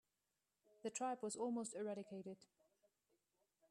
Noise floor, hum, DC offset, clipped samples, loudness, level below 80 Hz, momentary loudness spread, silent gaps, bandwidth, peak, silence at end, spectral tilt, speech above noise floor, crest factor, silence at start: under -90 dBFS; none; under 0.1%; under 0.1%; -47 LUFS; under -90 dBFS; 10 LU; none; 13 kHz; -32 dBFS; 1.35 s; -4 dB/octave; over 43 dB; 18 dB; 0.85 s